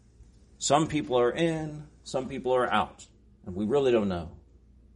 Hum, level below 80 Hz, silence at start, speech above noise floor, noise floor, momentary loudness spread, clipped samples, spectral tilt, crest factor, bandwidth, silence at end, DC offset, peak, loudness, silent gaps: none; -54 dBFS; 0.2 s; 29 dB; -56 dBFS; 15 LU; under 0.1%; -5 dB/octave; 20 dB; 10.5 kHz; 0.6 s; under 0.1%; -8 dBFS; -28 LUFS; none